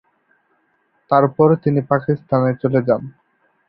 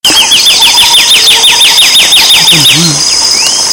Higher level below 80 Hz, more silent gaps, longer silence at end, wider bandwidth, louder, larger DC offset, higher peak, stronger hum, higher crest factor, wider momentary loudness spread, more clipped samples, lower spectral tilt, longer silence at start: second, -56 dBFS vs -38 dBFS; neither; first, 0.6 s vs 0 s; second, 5.2 kHz vs over 20 kHz; second, -17 LUFS vs -1 LUFS; neither; about the same, -2 dBFS vs 0 dBFS; neither; first, 18 dB vs 4 dB; about the same, 6 LU vs 4 LU; second, under 0.1% vs 10%; first, -13 dB/octave vs 0 dB/octave; first, 1.1 s vs 0.05 s